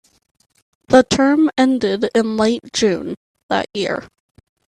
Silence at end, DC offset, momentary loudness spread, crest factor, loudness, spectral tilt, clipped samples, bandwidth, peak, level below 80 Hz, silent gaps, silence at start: 0.65 s; under 0.1%; 10 LU; 18 dB; -17 LUFS; -4.5 dB/octave; under 0.1%; 10.5 kHz; 0 dBFS; -50 dBFS; 3.17-3.34 s, 3.43-3.49 s; 0.9 s